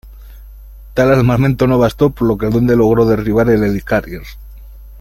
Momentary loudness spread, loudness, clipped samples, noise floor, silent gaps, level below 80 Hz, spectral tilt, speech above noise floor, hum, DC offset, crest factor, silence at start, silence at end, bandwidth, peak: 9 LU; -13 LUFS; under 0.1%; -34 dBFS; none; -32 dBFS; -8 dB/octave; 22 dB; none; under 0.1%; 14 dB; 0.05 s; 0 s; 16.5 kHz; 0 dBFS